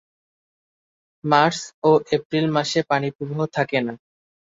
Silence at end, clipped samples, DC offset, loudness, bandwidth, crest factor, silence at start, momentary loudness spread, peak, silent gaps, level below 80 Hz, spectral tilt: 0.55 s; under 0.1%; under 0.1%; -21 LUFS; 7.8 kHz; 20 dB; 1.25 s; 9 LU; -2 dBFS; 1.74-1.82 s, 2.25-2.30 s, 3.15-3.19 s; -64 dBFS; -5 dB/octave